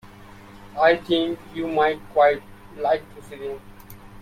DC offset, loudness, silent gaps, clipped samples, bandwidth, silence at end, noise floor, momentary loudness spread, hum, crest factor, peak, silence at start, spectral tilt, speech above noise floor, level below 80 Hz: under 0.1%; -22 LUFS; none; under 0.1%; 16 kHz; 0.05 s; -44 dBFS; 16 LU; none; 20 dB; -4 dBFS; 0.05 s; -5.5 dB/octave; 22 dB; -52 dBFS